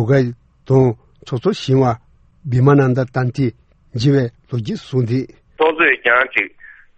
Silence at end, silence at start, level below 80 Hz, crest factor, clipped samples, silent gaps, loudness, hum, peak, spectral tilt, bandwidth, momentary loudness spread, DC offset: 0.3 s; 0 s; -48 dBFS; 16 dB; under 0.1%; none; -17 LUFS; none; 0 dBFS; -7.5 dB/octave; 8 kHz; 12 LU; under 0.1%